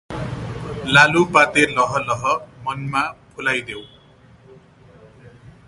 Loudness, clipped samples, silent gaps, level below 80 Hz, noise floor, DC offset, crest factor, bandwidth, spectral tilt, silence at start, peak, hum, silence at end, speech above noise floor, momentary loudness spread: -18 LUFS; under 0.1%; none; -48 dBFS; -49 dBFS; under 0.1%; 20 dB; 11.5 kHz; -4.5 dB/octave; 0.1 s; 0 dBFS; none; 0.15 s; 31 dB; 16 LU